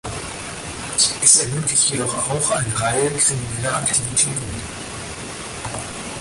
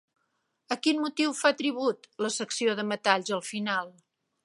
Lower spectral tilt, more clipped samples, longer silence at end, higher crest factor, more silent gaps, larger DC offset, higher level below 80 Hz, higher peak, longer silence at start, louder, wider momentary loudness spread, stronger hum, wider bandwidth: about the same, -2 dB/octave vs -3 dB/octave; neither; second, 0 s vs 0.55 s; about the same, 22 dB vs 24 dB; neither; neither; first, -44 dBFS vs -84 dBFS; first, 0 dBFS vs -6 dBFS; second, 0.05 s vs 0.7 s; first, -18 LUFS vs -28 LUFS; first, 16 LU vs 7 LU; neither; about the same, 12 kHz vs 11.5 kHz